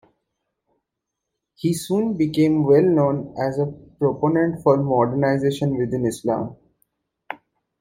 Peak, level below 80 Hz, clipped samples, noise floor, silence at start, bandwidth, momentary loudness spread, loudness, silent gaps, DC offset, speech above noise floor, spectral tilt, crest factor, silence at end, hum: -4 dBFS; -56 dBFS; under 0.1%; -82 dBFS; 1.65 s; 16 kHz; 11 LU; -20 LUFS; none; under 0.1%; 62 dB; -7.5 dB/octave; 18 dB; 0.45 s; none